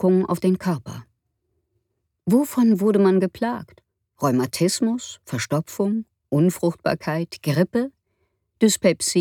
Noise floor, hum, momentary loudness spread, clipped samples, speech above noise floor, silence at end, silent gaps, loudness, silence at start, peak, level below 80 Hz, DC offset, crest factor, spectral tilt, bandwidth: -74 dBFS; none; 12 LU; under 0.1%; 53 dB; 0 s; none; -22 LUFS; 0 s; -4 dBFS; -62 dBFS; under 0.1%; 18 dB; -5.5 dB/octave; 18.5 kHz